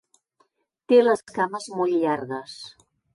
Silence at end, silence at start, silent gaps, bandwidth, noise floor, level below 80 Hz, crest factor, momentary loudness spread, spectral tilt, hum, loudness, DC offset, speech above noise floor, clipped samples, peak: 0.45 s; 0.9 s; none; 11.5 kHz; -68 dBFS; -72 dBFS; 18 dB; 21 LU; -5 dB/octave; none; -23 LUFS; under 0.1%; 46 dB; under 0.1%; -6 dBFS